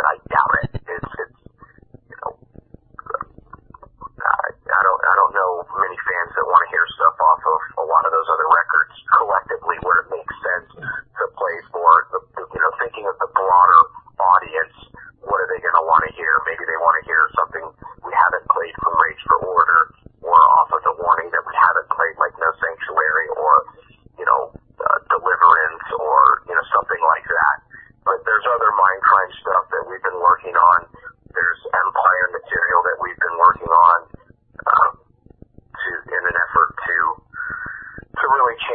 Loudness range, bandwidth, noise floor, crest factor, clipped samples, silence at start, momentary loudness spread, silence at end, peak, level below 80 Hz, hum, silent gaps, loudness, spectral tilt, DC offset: 4 LU; 4.5 kHz; -49 dBFS; 18 dB; under 0.1%; 0 s; 14 LU; 0 s; 0 dBFS; -50 dBFS; none; none; -17 LUFS; -7 dB/octave; under 0.1%